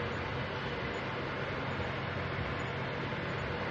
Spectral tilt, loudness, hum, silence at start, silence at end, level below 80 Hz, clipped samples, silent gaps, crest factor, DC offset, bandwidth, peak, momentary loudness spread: -6.5 dB/octave; -36 LUFS; none; 0 s; 0 s; -54 dBFS; under 0.1%; none; 12 dB; under 0.1%; 8 kHz; -24 dBFS; 1 LU